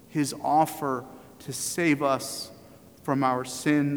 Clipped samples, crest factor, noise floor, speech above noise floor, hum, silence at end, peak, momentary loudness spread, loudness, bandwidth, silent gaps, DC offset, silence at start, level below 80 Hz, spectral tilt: under 0.1%; 18 dB; -51 dBFS; 25 dB; none; 0 s; -10 dBFS; 14 LU; -27 LUFS; over 20 kHz; none; under 0.1%; 0.1 s; -66 dBFS; -4.5 dB/octave